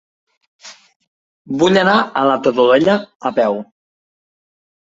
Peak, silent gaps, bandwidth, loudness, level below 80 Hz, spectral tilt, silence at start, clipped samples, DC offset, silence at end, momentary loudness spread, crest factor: -2 dBFS; 0.96-1.00 s, 1.07-1.45 s, 3.15-3.20 s; 8 kHz; -15 LUFS; -58 dBFS; -5.5 dB/octave; 0.65 s; under 0.1%; under 0.1%; 1.2 s; 8 LU; 16 dB